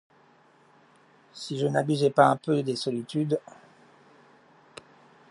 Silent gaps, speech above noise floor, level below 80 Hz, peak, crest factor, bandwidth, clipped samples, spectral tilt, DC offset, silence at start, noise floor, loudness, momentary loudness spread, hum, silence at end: none; 34 dB; -78 dBFS; -6 dBFS; 24 dB; 11.5 kHz; under 0.1%; -6 dB/octave; under 0.1%; 1.35 s; -60 dBFS; -26 LUFS; 28 LU; none; 1.9 s